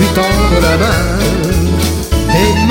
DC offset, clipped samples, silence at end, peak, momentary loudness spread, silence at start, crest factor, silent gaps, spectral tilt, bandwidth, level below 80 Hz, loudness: under 0.1%; under 0.1%; 0 s; 0 dBFS; 4 LU; 0 s; 10 dB; none; -5 dB/octave; 17 kHz; -18 dBFS; -12 LUFS